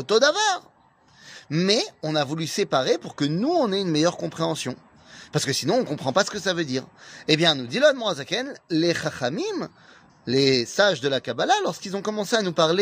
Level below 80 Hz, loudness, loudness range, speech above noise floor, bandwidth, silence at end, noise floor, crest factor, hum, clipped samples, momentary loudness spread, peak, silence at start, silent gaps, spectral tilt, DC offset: -66 dBFS; -23 LUFS; 2 LU; 34 dB; 15.5 kHz; 0 s; -57 dBFS; 20 dB; none; under 0.1%; 10 LU; -4 dBFS; 0 s; none; -4 dB/octave; under 0.1%